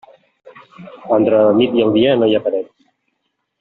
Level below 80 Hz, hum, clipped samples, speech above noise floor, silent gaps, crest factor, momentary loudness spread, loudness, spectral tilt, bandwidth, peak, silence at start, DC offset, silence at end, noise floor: -58 dBFS; none; under 0.1%; 57 dB; none; 14 dB; 13 LU; -14 LUFS; -5 dB/octave; 4.2 kHz; -2 dBFS; 0.45 s; under 0.1%; 0.95 s; -71 dBFS